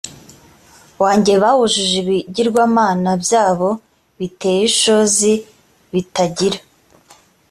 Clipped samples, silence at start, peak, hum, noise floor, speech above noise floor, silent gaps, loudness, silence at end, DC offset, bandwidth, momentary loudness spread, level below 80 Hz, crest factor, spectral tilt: under 0.1%; 0.05 s; -2 dBFS; none; -49 dBFS; 35 dB; none; -15 LUFS; 0.9 s; under 0.1%; 14.5 kHz; 11 LU; -56 dBFS; 14 dB; -3.5 dB/octave